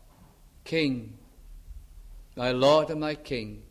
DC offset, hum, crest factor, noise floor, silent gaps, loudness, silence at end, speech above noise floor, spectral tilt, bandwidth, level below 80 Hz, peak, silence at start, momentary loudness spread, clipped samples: under 0.1%; none; 22 dB; -55 dBFS; none; -27 LUFS; 0.05 s; 29 dB; -5.5 dB/octave; 14.5 kHz; -50 dBFS; -8 dBFS; 0.65 s; 24 LU; under 0.1%